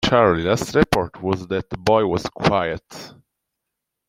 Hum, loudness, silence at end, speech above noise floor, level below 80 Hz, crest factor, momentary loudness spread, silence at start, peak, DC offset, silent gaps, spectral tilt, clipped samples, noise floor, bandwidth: none; -20 LUFS; 1 s; 61 dB; -44 dBFS; 20 dB; 11 LU; 0 s; -2 dBFS; under 0.1%; none; -5.5 dB/octave; under 0.1%; -81 dBFS; 16 kHz